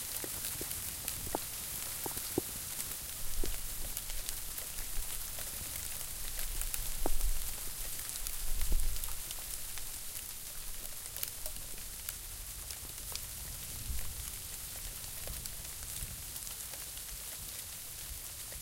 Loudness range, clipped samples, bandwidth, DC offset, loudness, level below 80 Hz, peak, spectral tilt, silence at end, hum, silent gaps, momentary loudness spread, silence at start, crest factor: 3 LU; under 0.1%; 17 kHz; under 0.1%; -39 LUFS; -42 dBFS; -10 dBFS; -2 dB/octave; 0 s; none; none; 5 LU; 0 s; 28 dB